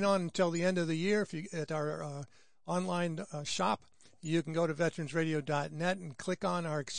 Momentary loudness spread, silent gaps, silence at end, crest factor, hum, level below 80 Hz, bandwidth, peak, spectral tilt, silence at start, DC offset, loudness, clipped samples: 9 LU; none; 0 s; 18 dB; none; -70 dBFS; 10.5 kHz; -16 dBFS; -5.5 dB/octave; 0 s; 0.2%; -34 LUFS; under 0.1%